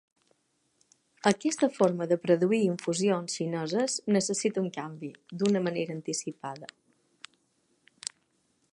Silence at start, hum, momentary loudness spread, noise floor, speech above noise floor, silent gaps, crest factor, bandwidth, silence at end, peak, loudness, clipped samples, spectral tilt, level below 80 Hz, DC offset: 1.25 s; none; 14 LU; -72 dBFS; 44 dB; none; 24 dB; 11.5 kHz; 2.05 s; -6 dBFS; -29 LUFS; under 0.1%; -4.5 dB/octave; -76 dBFS; under 0.1%